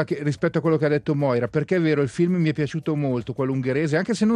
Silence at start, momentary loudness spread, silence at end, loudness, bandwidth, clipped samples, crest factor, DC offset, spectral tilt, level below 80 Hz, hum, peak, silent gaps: 0 s; 4 LU; 0 s; -23 LUFS; 10.5 kHz; under 0.1%; 14 dB; under 0.1%; -7.5 dB/octave; -58 dBFS; none; -8 dBFS; none